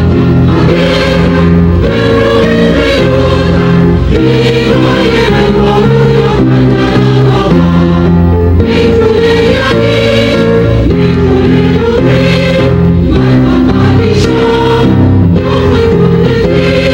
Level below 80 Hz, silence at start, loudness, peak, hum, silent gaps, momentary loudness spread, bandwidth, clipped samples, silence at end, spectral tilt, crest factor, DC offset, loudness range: -20 dBFS; 0 s; -7 LUFS; 0 dBFS; none; none; 1 LU; 10 kHz; 0.2%; 0 s; -7.5 dB/octave; 6 dB; under 0.1%; 0 LU